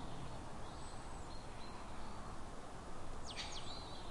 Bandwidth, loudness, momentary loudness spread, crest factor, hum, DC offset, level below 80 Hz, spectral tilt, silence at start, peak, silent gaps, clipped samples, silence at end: 11.5 kHz; -50 LUFS; 6 LU; 14 dB; none; under 0.1%; -52 dBFS; -4 dB/octave; 0 s; -32 dBFS; none; under 0.1%; 0 s